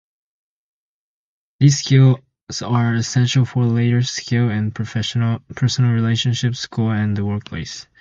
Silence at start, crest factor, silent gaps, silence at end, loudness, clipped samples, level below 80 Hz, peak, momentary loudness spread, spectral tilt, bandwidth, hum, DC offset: 1.6 s; 18 dB; 2.41-2.47 s; 0.2 s; -18 LUFS; under 0.1%; -48 dBFS; -2 dBFS; 10 LU; -5.5 dB/octave; 7.6 kHz; none; under 0.1%